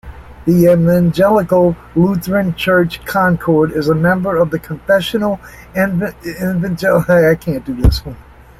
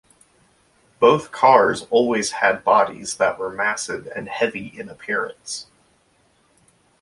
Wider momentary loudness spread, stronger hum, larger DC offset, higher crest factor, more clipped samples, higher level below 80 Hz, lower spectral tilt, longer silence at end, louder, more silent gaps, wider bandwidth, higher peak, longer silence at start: second, 10 LU vs 16 LU; neither; neither; second, 12 dB vs 20 dB; neither; first, -28 dBFS vs -62 dBFS; first, -7 dB/octave vs -3.5 dB/octave; second, 0.4 s vs 1.4 s; first, -14 LUFS vs -19 LUFS; neither; first, 15.5 kHz vs 11.5 kHz; about the same, 0 dBFS vs 0 dBFS; second, 0.05 s vs 1 s